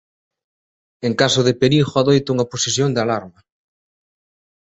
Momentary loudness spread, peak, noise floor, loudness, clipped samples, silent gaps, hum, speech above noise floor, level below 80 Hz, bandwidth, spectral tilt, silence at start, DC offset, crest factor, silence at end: 8 LU; -2 dBFS; under -90 dBFS; -17 LUFS; under 0.1%; none; none; over 73 dB; -54 dBFS; 8.2 kHz; -4.5 dB/octave; 1 s; under 0.1%; 18 dB; 1.35 s